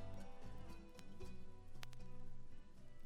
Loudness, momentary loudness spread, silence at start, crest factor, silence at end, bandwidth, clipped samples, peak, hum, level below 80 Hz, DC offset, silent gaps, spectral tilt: -60 LUFS; 7 LU; 0 s; 18 dB; 0 s; 8.8 kHz; under 0.1%; -30 dBFS; none; -54 dBFS; under 0.1%; none; -5.5 dB/octave